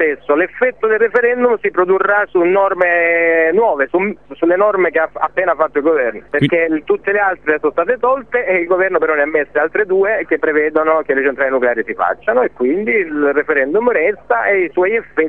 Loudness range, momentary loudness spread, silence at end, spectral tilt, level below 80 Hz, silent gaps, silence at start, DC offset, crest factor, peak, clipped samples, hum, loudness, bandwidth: 2 LU; 4 LU; 0 s; -8.5 dB/octave; -52 dBFS; none; 0 s; 0.5%; 14 dB; 0 dBFS; under 0.1%; none; -14 LUFS; 3.9 kHz